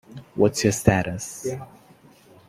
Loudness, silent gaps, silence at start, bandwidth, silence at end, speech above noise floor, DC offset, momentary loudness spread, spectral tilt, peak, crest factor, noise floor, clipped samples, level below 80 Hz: -23 LUFS; none; 0.1 s; 16 kHz; 0.8 s; 30 dB; under 0.1%; 14 LU; -5 dB/octave; -2 dBFS; 22 dB; -52 dBFS; under 0.1%; -48 dBFS